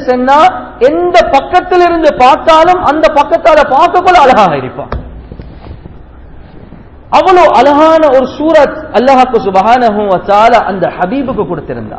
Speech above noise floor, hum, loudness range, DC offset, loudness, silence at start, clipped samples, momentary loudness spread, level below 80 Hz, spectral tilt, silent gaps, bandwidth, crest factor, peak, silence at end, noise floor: 25 dB; none; 5 LU; 0.4%; -7 LUFS; 0 s; 8%; 9 LU; -32 dBFS; -5.5 dB/octave; none; 8 kHz; 8 dB; 0 dBFS; 0 s; -31 dBFS